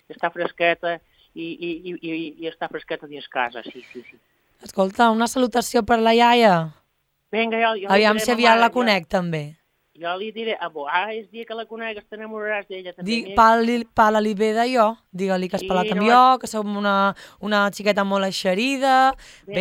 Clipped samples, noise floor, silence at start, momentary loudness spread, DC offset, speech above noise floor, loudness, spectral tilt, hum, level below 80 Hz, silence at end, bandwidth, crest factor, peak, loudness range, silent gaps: under 0.1%; -70 dBFS; 0.1 s; 17 LU; under 0.1%; 49 dB; -20 LUFS; -4.5 dB/octave; none; -54 dBFS; 0 s; 16.5 kHz; 20 dB; 0 dBFS; 10 LU; none